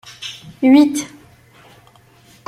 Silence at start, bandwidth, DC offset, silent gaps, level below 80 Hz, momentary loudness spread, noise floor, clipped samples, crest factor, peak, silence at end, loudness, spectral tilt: 0.2 s; 13.5 kHz; under 0.1%; none; -60 dBFS; 19 LU; -49 dBFS; under 0.1%; 16 dB; -2 dBFS; 1.4 s; -14 LUFS; -4 dB/octave